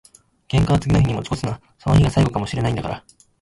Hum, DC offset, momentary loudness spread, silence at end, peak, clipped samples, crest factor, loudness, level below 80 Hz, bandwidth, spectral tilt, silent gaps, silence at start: none; under 0.1%; 12 LU; 0.4 s; -6 dBFS; under 0.1%; 14 dB; -20 LUFS; -34 dBFS; 11.5 kHz; -7 dB/octave; none; 0.5 s